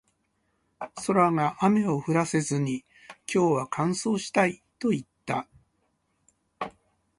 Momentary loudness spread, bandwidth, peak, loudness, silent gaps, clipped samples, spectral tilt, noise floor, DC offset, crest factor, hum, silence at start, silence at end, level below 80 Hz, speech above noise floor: 15 LU; 11.5 kHz; -8 dBFS; -26 LUFS; none; under 0.1%; -5.5 dB/octave; -73 dBFS; under 0.1%; 20 dB; none; 0.8 s; 0.5 s; -66 dBFS; 48 dB